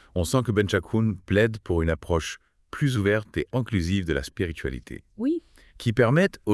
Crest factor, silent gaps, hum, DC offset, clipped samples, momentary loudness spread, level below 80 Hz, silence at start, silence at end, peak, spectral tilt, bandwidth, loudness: 18 dB; none; none; under 0.1%; under 0.1%; 11 LU; -44 dBFS; 0.15 s; 0 s; -6 dBFS; -6.5 dB/octave; 12 kHz; -25 LUFS